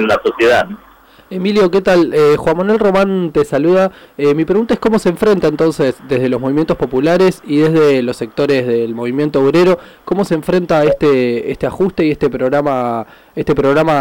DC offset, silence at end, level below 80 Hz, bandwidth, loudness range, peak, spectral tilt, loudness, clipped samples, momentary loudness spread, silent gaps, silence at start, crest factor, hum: 0.4%; 0 s; -42 dBFS; 17 kHz; 2 LU; -6 dBFS; -7 dB/octave; -13 LUFS; under 0.1%; 7 LU; none; 0 s; 8 dB; none